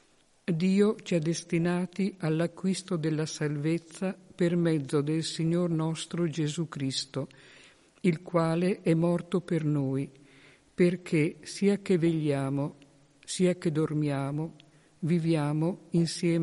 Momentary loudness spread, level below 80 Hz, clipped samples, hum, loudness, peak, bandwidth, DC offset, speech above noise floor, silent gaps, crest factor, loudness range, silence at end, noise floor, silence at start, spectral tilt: 8 LU; -68 dBFS; under 0.1%; none; -29 LUFS; -12 dBFS; 11.5 kHz; under 0.1%; 29 dB; none; 16 dB; 2 LU; 0 s; -58 dBFS; 0.5 s; -6.5 dB/octave